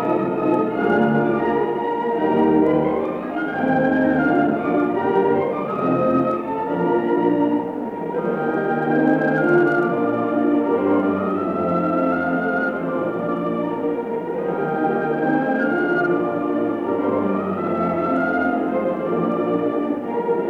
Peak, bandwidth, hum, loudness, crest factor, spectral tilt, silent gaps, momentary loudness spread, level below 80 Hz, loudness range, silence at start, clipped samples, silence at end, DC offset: -6 dBFS; 5.2 kHz; none; -20 LUFS; 14 dB; -9 dB/octave; none; 6 LU; -58 dBFS; 3 LU; 0 s; under 0.1%; 0 s; under 0.1%